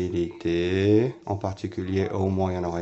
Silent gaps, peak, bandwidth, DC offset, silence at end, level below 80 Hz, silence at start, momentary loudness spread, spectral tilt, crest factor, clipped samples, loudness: none; -10 dBFS; 8 kHz; under 0.1%; 0 s; -56 dBFS; 0 s; 9 LU; -7.5 dB/octave; 16 dB; under 0.1%; -25 LUFS